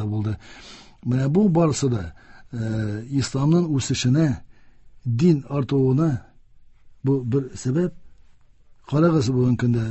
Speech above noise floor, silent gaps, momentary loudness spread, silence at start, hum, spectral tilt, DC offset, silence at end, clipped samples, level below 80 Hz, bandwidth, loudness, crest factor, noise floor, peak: 30 dB; none; 14 LU; 0 s; none; -7 dB/octave; under 0.1%; 0 s; under 0.1%; -48 dBFS; 8.6 kHz; -22 LUFS; 16 dB; -51 dBFS; -6 dBFS